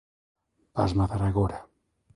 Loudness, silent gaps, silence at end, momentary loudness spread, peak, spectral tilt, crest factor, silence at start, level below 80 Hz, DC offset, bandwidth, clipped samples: -27 LUFS; none; 0.5 s; 10 LU; -10 dBFS; -8.5 dB/octave; 20 dB; 0.75 s; -42 dBFS; under 0.1%; 10.5 kHz; under 0.1%